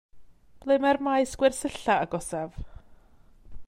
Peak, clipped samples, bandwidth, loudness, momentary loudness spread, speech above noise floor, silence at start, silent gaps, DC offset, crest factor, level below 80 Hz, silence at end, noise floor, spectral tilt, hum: -8 dBFS; under 0.1%; 14 kHz; -26 LUFS; 16 LU; 29 dB; 0.15 s; none; under 0.1%; 20 dB; -50 dBFS; 0 s; -55 dBFS; -4.5 dB/octave; none